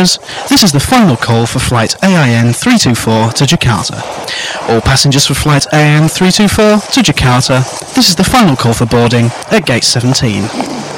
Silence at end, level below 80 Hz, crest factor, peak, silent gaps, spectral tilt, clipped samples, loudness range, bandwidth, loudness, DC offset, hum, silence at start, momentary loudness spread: 0 s; -30 dBFS; 10 dB; 0 dBFS; none; -4.5 dB/octave; under 0.1%; 2 LU; 16.5 kHz; -9 LUFS; under 0.1%; none; 0 s; 7 LU